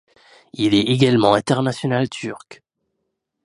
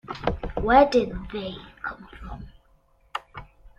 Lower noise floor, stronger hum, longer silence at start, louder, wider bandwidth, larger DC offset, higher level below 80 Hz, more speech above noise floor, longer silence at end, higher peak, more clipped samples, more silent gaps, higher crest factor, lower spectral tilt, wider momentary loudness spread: first, -76 dBFS vs -61 dBFS; neither; first, 0.6 s vs 0.05 s; first, -18 LUFS vs -24 LUFS; first, 11.5 kHz vs 10 kHz; neither; second, -56 dBFS vs -42 dBFS; first, 58 dB vs 39 dB; first, 0.9 s vs 0.1 s; first, 0 dBFS vs -4 dBFS; neither; neither; about the same, 20 dB vs 22 dB; about the same, -6 dB/octave vs -6.5 dB/octave; second, 16 LU vs 24 LU